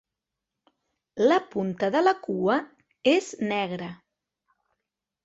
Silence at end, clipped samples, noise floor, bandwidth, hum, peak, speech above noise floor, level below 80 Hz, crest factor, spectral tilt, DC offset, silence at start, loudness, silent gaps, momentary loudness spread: 1.3 s; under 0.1%; -86 dBFS; 8 kHz; none; -8 dBFS; 62 dB; -70 dBFS; 20 dB; -5.5 dB/octave; under 0.1%; 1.15 s; -25 LUFS; none; 10 LU